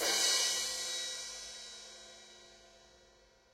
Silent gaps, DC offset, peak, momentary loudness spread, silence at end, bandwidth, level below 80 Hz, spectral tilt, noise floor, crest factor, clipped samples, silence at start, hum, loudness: none; under 0.1%; -18 dBFS; 25 LU; 0.75 s; 16 kHz; -72 dBFS; 2 dB/octave; -65 dBFS; 20 dB; under 0.1%; 0 s; none; -33 LUFS